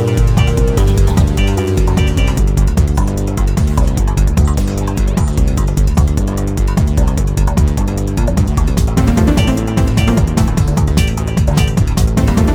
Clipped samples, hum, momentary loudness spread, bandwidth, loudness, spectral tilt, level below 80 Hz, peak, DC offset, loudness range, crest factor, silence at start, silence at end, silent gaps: under 0.1%; none; 4 LU; 15.5 kHz; -14 LUFS; -6.5 dB/octave; -14 dBFS; 0 dBFS; under 0.1%; 1 LU; 12 dB; 0 s; 0 s; none